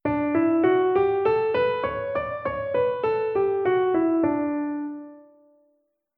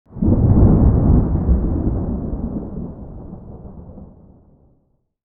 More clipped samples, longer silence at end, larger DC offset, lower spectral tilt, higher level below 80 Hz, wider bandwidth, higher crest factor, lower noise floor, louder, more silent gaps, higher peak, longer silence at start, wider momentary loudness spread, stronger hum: neither; second, 0.95 s vs 1.2 s; neither; second, -9.5 dB/octave vs -15.5 dB/octave; second, -56 dBFS vs -22 dBFS; first, 4.8 kHz vs 2 kHz; about the same, 14 dB vs 16 dB; first, -70 dBFS vs -62 dBFS; second, -23 LUFS vs -17 LUFS; neither; second, -10 dBFS vs -2 dBFS; about the same, 0.05 s vs 0.1 s; second, 8 LU vs 24 LU; neither